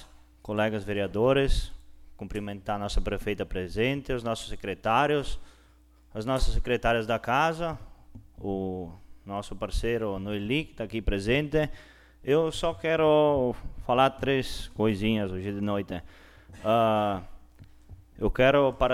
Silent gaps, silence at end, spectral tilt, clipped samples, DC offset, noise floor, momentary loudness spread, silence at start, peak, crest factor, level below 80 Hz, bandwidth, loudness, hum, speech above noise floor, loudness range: none; 0 s; -6 dB/octave; under 0.1%; under 0.1%; -58 dBFS; 14 LU; 0 s; -8 dBFS; 18 dB; -38 dBFS; 15 kHz; -28 LUFS; none; 31 dB; 5 LU